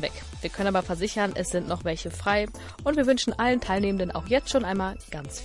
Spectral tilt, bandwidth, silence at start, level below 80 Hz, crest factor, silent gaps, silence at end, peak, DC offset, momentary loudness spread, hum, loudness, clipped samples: -4.5 dB/octave; 11.5 kHz; 0 s; -42 dBFS; 18 dB; none; 0 s; -10 dBFS; under 0.1%; 10 LU; none; -27 LUFS; under 0.1%